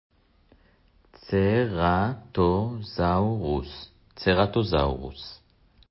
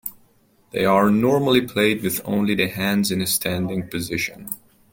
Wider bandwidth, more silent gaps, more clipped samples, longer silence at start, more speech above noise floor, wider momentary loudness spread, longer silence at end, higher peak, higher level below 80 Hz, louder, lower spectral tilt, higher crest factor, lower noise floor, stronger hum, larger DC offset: second, 5.8 kHz vs 17 kHz; neither; neither; first, 1.25 s vs 0.05 s; about the same, 36 dB vs 38 dB; first, 17 LU vs 13 LU; first, 0.55 s vs 0.35 s; second, -8 dBFS vs -2 dBFS; first, -40 dBFS vs -54 dBFS; second, -25 LUFS vs -20 LUFS; first, -11 dB/octave vs -4.5 dB/octave; about the same, 18 dB vs 18 dB; about the same, -60 dBFS vs -58 dBFS; neither; neither